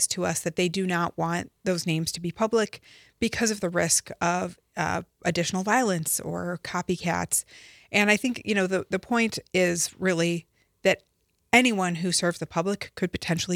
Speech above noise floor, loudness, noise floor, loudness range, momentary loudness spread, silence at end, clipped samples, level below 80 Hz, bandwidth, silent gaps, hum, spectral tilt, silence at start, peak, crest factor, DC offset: 45 dB; -26 LUFS; -71 dBFS; 2 LU; 8 LU; 0 s; under 0.1%; -60 dBFS; 16.5 kHz; none; none; -3.5 dB/octave; 0 s; -4 dBFS; 22 dB; under 0.1%